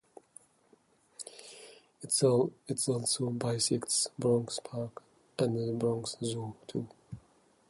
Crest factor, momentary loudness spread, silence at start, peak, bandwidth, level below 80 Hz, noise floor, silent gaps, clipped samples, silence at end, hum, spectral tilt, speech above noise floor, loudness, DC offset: 20 dB; 20 LU; 1.2 s; -14 dBFS; 12 kHz; -70 dBFS; -67 dBFS; none; under 0.1%; 0.5 s; none; -4.5 dB/octave; 35 dB; -32 LUFS; under 0.1%